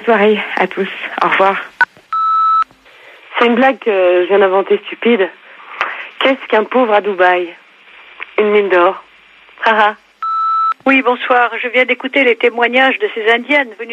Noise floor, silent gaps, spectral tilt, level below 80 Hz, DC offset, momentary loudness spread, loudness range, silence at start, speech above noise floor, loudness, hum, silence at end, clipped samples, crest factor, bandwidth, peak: -44 dBFS; none; -5.5 dB/octave; -68 dBFS; under 0.1%; 9 LU; 3 LU; 0 s; 31 dB; -13 LUFS; none; 0 s; under 0.1%; 14 dB; 8.2 kHz; 0 dBFS